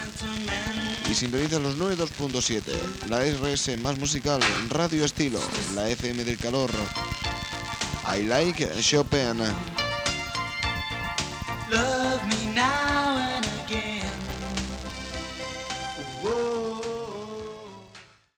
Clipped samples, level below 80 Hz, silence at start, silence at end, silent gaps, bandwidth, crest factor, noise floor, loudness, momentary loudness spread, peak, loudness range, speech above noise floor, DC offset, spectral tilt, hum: under 0.1%; -44 dBFS; 0 s; 0.35 s; none; 20 kHz; 20 dB; -51 dBFS; -27 LUFS; 10 LU; -8 dBFS; 6 LU; 25 dB; under 0.1%; -3.5 dB/octave; none